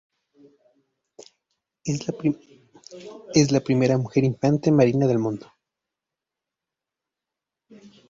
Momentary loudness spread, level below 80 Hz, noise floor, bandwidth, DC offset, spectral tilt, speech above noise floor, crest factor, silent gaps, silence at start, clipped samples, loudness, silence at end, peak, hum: 17 LU; -60 dBFS; -87 dBFS; 7.8 kHz; under 0.1%; -6.5 dB/octave; 66 dB; 22 dB; none; 1.85 s; under 0.1%; -22 LUFS; 2.7 s; -4 dBFS; none